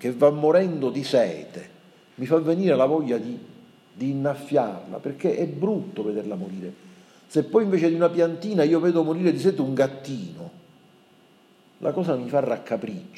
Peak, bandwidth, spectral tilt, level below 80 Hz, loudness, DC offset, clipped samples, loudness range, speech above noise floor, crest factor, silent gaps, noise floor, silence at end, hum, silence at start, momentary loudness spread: -6 dBFS; 13 kHz; -7.5 dB/octave; -78 dBFS; -23 LUFS; under 0.1%; under 0.1%; 5 LU; 33 dB; 18 dB; none; -56 dBFS; 0 s; none; 0 s; 15 LU